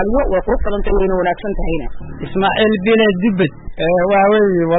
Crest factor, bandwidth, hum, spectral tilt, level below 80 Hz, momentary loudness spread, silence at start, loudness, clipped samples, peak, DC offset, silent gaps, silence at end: 12 dB; 4 kHz; none; -12 dB/octave; -26 dBFS; 10 LU; 0 s; -15 LUFS; under 0.1%; -2 dBFS; under 0.1%; none; 0 s